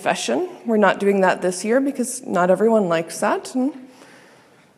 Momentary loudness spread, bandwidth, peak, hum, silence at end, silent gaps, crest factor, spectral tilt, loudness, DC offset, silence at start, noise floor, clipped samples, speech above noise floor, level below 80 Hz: 7 LU; 14.5 kHz; -2 dBFS; none; 0.9 s; none; 18 dB; -4.5 dB/octave; -20 LUFS; under 0.1%; 0 s; -51 dBFS; under 0.1%; 32 dB; -76 dBFS